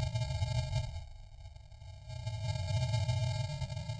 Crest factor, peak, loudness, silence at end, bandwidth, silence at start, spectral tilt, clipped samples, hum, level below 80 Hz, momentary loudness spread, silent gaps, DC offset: 14 dB; -22 dBFS; -36 LUFS; 0 s; 10 kHz; 0 s; -5.5 dB/octave; under 0.1%; none; -48 dBFS; 20 LU; none; under 0.1%